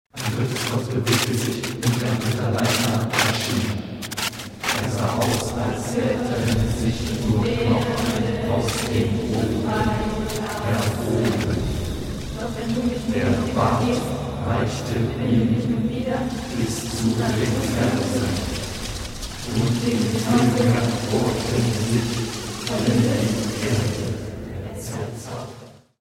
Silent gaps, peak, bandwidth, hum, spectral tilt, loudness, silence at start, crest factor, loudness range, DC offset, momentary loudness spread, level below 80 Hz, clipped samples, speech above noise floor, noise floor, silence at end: none; -4 dBFS; 16.5 kHz; none; -5.5 dB/octave; -23 LUFS; 0.15 s; 18 dB; 3 LU; under 0.1%; 9 LU; -38 dBFS; under 0.1%; 21 dB; -43 dBFS; 0.25 s